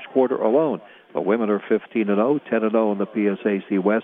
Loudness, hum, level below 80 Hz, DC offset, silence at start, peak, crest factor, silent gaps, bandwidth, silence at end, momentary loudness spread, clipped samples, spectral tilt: -22 LUFS; none; -80 dBFS; under 0.1%; 0 s; -4 dBFS; 16 dB; none; 3.8 kHz; 0 s; 5 LU; under 0.1%; -10.5 dB/octave